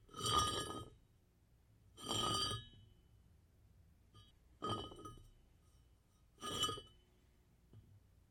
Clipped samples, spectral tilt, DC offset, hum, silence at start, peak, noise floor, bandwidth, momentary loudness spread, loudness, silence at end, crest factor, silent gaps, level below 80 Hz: under 0.1%; -2.5 dB/octave; under 0.1%; 60 Hz at -80 dBFS; 0.1 s; -22 dBFS; -72 dBFS; 16.5 kHz; 19 LU; -41 LUFS; 0.35 s; 24 dB; none; -64 dBFS